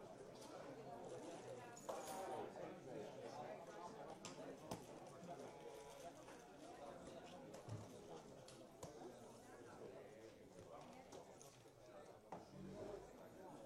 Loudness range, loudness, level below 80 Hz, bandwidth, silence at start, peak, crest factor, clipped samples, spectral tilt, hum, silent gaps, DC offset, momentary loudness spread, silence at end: 6 LU; -57 LUFS; -80 dBFS; 15 kHz; 0 s; -34 dBFS; 22 dB; under 0.1%; -4.5 dB/octave; none; none; under 0.1%; 8 LU; 0 s